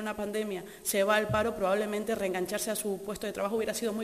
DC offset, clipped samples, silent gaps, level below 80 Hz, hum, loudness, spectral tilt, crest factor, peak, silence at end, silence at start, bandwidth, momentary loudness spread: under 0.1%; under 0.1%; none; -58 dBFS; none; -31 LUFS; -4 dB/octave; 18 dB; -12 dBFS; 0 s; 0 s; 15.5 kHz; 9 LU